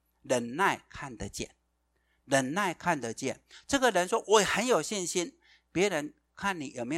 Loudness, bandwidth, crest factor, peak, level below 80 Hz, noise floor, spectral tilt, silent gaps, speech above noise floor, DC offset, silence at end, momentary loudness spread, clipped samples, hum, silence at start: -30 LUFS; 16 kHz; 22 dB; -8 dBFS; -60 dBFS; -75 dBFS; -3 dB/octave; none; 45 dB; under 0.1%; 0 s; 15 LU; under 0.1%; none; 0.25 s